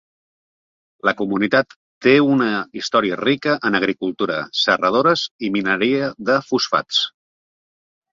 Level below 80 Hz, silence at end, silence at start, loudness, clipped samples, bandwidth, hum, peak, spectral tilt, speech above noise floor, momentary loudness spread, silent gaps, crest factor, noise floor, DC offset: -62 dBFS; 1.05 s; 1.05 s; -18 LUFS; under 0.1%; 7.6 kHz; none; -2 dBFS; -4.5 dB/octave; over 72 dB; 7 LU; 1.76-2.01 s, 5.31-5.39 s; 18 dB; under -90 dBFS; under 0.1%